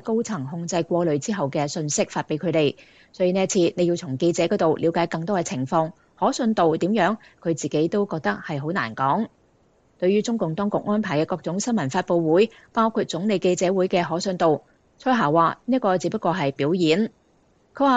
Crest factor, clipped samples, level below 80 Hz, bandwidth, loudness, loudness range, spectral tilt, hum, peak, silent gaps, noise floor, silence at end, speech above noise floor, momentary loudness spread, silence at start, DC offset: 16 dB; under 0.1%; -64 dBFS; 9.2 kHz; -23 LUFS; 3 LU; -5.5 dB/octave; none; -6 dBFS; none; -61 dBFS; 0 s; 39 dB; 6 LU; 0.05 s; under 0.1%